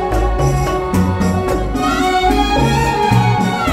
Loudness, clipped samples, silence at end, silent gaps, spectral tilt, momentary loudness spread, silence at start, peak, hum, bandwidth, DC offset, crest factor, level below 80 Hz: -15 LUFS; under 0.1%; 0 s; none; -6 dB/octave; 4 LU; 0 s; -2 dBFS; none; 16 kHz; under 0.1%; 14 dB; -24 dBFS